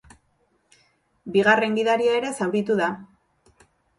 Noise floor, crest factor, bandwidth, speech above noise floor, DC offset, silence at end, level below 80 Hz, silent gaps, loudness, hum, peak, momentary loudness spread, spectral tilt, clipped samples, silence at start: -67 dBFS; 18 dB; 11.5 kHz; 46 dB; under 0.1%; 0.95 s; -64 dBFS; none; -22 LUFS; none; -6 dBFS; 9 LU; -5 dB/octave; under 0.1%; 1.25 s